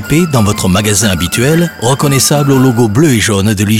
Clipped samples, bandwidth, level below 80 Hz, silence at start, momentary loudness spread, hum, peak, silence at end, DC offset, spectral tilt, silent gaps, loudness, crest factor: under 0.1%; 17.5 kHz; -38 dBFS; 0 s; 3 LU; none; 0 dBFS; 0 s; under 0.1%; -4.5 dB/octave; none; -10 LUFS; 10 dB